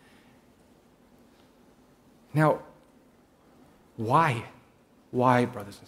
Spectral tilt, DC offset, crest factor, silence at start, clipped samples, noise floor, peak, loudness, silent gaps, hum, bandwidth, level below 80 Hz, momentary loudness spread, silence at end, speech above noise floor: -7 dB/octave; under 0.1%; 24 dB; 2.35 s; under 0.1%; -60 dBFS; -6 dBFS; -26 LUFS; none; none; 15.5 kHz; -66 dBFS; 13 LU; 0.1 s; 35 dB